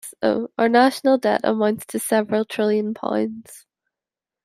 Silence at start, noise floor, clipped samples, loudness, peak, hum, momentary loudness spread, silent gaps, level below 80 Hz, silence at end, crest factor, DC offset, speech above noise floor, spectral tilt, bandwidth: 0.05 s; -89 dBFS; under 0.1%; -20 LUFS; -2 dBFS; none; 8 LU; none; -68 dBFS; 0.85 s; 18 dB; under 0.1%; 69 dB; -4.5 dB/octave; 16 kHz